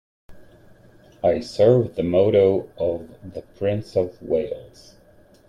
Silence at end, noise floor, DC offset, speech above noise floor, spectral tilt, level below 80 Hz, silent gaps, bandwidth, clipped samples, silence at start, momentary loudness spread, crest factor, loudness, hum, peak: 0.8 s; -52 dBFS; under 0.1%; 31 dB; -8 dB/octave; -54 dBFS; none; 10 kHz; under 0.1%; 0.3 s; 17 LU; 18 dB; -21 LUFS; none; -4 dBFS